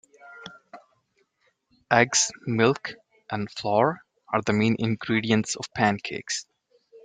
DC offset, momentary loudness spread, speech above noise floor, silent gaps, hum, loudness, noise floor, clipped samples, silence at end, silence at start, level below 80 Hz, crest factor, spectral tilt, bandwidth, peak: under 0.1%; 18 LU; 46 dB; none; none; -24 LUFS; -70 dBFS; under 0.1%; 0.05 s; 0.25 s; -64 dBFS; 24 dB; -4 dB/octave; 9.6 kHz; -2 dBFS